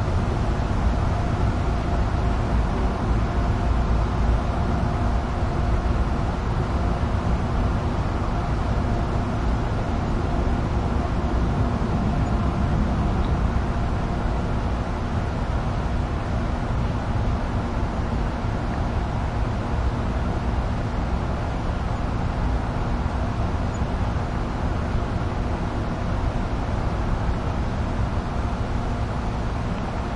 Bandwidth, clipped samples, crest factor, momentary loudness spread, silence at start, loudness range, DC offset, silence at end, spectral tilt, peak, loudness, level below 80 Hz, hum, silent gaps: 10.5 kHz; under 0.1%; 14 dB; 3 LU; 0 s; 2 LU; under 0.1%; 0 s; -7.5 dB/octave; -10 dBFS; -25 LUFS; -26 dBFS; none; none